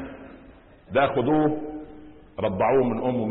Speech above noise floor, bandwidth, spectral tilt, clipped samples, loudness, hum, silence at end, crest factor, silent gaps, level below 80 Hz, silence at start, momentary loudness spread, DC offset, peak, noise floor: 27 dB; 4.1 kHz; -11.5 dB/octave; under 0.1%; -24 LUFS; none; 0 s; 16 dB; none; -52 dBFS; 0 s; 19 LU; under 0.1%; -10 dBFS; -50 dBFS